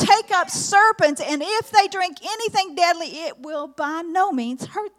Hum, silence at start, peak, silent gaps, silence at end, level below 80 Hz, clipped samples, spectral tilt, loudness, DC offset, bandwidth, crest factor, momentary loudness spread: none; 0 s; -2 dBFS; none; 0.1 s; -68 dBFS; under 0.1%; -2.5 dB/octave; -20 LUFS; under 0.1%; 15.5 kHz; 18 dB; 14 LU